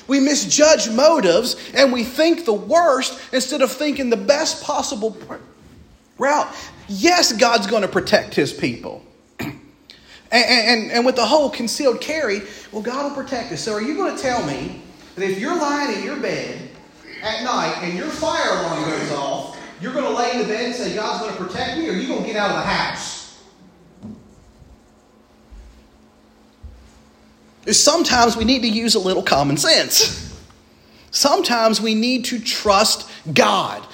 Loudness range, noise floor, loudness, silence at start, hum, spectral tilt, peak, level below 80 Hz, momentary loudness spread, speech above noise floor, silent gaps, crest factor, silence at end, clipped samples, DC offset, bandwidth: 8 LU; -52 dBFS; -18 LUFS; 0.1 s; none; -2.5 dB/octave; 0 dBFS; -50 dBFS; 15 LU; 33 dB; none; 20 dB; 0 s; under 0.1%; under 0.1%; 16.5 kHz